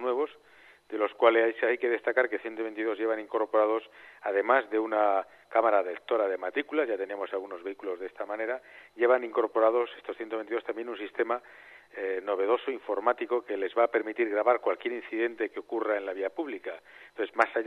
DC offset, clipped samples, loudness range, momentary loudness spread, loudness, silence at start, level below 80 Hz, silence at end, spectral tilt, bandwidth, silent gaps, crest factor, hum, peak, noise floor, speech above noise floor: under 0.1%; under 0.1%; 4 LU; 11 LU; -29 LUFS; 0 s; -80 dBFS; 0 s; -5 dB/octave; 6.2 kHz; none; 24 dB; none; -6 dBFS; -57 dBFS; 28 dB